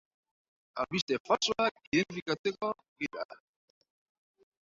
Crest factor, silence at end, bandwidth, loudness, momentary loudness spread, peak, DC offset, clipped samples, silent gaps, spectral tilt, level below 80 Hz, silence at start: 22 dB; 1.3 s; 7.8 kHz; -32 LUFS; 11 LU; -14 dBFS; under 0.1%; under 0.1%; 1.02-1.08 s, 1.20-1.25 s, 1.71-1.75 s, 1.87-1.92 s, 2.22-2.26 s, 2.39-2.44 s, 2.88-2.96 s, 3.25-3.29 s; -4 dB/octave; -70 dBFS; 0.75 s